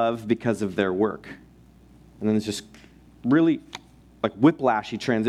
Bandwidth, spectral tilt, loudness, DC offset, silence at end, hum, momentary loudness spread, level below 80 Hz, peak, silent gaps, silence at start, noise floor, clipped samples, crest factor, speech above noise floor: 13.5 kHz; -6.5 dB/octave; -24 LUFS; under 0.1%; 0 s; none; 15 LU; -58 dBFS; -6 dBFS; none; 0 s; -52 dBFS; under 0.1%; 20 dB; 29 dB